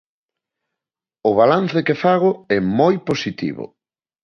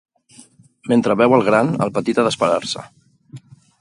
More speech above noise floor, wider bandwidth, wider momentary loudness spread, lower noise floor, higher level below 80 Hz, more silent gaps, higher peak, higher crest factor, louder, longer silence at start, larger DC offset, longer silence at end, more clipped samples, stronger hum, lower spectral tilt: first, 70 dB vs 32 dB; second, 7 kHz vs 11.5 kHz; about the same, 12 LU vs 12 LU; first, -87 dBFS vs -48 dBFS; about the same, -56 dBFS vs -60 dBFS; neither; about the same, -2 dBFS vs 0 dBFS; about the same, 16 dB vs 18 dB; about the same, -18 LUFS vs -17 LUFS; first, 1.25 s vs 0.85 s; neither; about the same, 0.55 s vs 0.45 s; neither; neither; first, -7 dB/octave vs -5.5 dB/octave